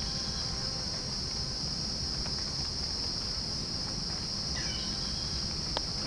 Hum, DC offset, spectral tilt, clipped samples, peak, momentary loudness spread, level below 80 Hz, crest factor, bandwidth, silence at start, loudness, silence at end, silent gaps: none; under 0.1%; -2.5 dB/octave; under 0.1%; -12 dBFS; 1 LU; -44 dBFS; 22 dB; 10.5 kHz; 0 s; -32 LUFS; 0 s; none